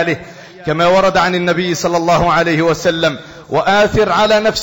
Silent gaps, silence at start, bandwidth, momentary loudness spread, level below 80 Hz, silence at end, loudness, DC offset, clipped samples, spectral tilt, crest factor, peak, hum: none; 0 s; 17 kHz; 8 LU; -38 dBFS; 0 s; -13 LUFS; under 0.1%; under 0.1%; -4.5 dB/octave; 10 dB; -4 dBFS; none